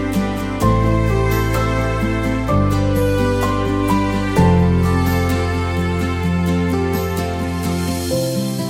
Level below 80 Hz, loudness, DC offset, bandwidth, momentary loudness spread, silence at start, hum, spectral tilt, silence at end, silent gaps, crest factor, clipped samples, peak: -26 dBFS; -18 LUFS; under 0.1%; 17 kHz; 5 LU; 0 s; none; -6.5 dB/octave; 0 s; none; 14 dB; under 0.1%; -2 dBFS